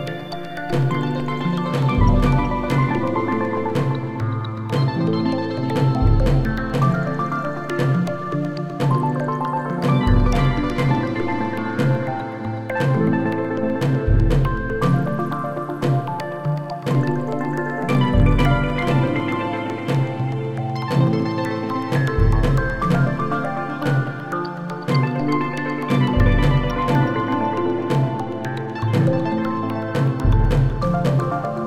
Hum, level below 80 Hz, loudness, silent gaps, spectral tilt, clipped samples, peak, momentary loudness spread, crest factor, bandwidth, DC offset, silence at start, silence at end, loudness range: none; -28 dBFS; -21 LUFS; none; -8 dB/octave; under 0.1%; -4 dBFS; 7 LU; 16 dB; 12 kHz; 0.6%; 0 s; 0 s; 2 LU